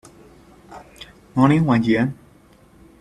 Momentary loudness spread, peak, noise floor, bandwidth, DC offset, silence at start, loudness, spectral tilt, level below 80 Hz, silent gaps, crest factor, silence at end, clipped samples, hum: 26 LU; -2 dBFS; -51 dBFS; 12 kHz; under 0.1%; 0.7 s; -18 LUFS; -8 dB/octave; -52 dBFS; none; 20 dB; 0.85 s; under 0.1%; none